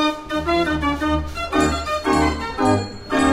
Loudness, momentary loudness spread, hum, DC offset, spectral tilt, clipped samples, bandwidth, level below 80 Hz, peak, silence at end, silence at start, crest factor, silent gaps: -20 LUFS; 4 LU; none; under 0.1%; -5 dB/octave; under 0.1%; 15.5 kHz; -32 dBFS; -4 dBFS; 0 s; 0 s; 16 dB; none